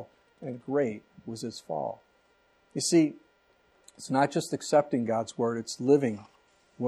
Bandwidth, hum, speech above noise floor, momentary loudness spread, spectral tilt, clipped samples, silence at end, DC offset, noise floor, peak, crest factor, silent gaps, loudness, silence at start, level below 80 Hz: 13.5 kHz; none; 38 dB; 18 LU; -5 dB/octave; under 0.1%; 0 s; under 0.1%; -66 dBFS; -10 dBFS; 20 dB; none; -29 LUFS; 0 s; -76 dBFS